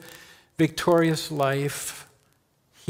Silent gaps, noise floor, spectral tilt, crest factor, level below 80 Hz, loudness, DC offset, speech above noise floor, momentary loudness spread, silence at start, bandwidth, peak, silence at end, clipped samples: none; -66 dBFS; -5 dB/octave; 18 dB; -60 dBFS; -24 LUFS; under 0.1%; 42 dB; 21 LU; 0 s; 16.5 kHz; -8 dBFS; 0.85 s; under 0.1%